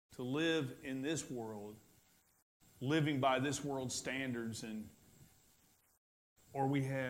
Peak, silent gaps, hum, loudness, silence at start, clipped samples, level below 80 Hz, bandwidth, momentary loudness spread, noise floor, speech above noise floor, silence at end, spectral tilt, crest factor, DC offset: -20 dBFS; 2.42-2.60 s, 5.97-6.36 s; none; -39 LUFS; 0.1 s; under 0.1%; -74 dBFS; 16 kHz; 14 LU; -71 dBFS; 33 dB; 0 s; -5 dB/octave; 20 dB; under 0.1%